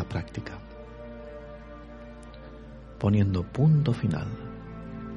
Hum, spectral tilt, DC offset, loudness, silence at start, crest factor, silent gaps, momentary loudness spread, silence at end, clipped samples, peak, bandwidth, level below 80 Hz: none; -9 dB/octave; under 0.1%; -27 LUFS; 0 s; 16 dB; none; 22 LU; 0 s; under 0.1%; -12 dBFS; 7.4 kHz; -48 dBFS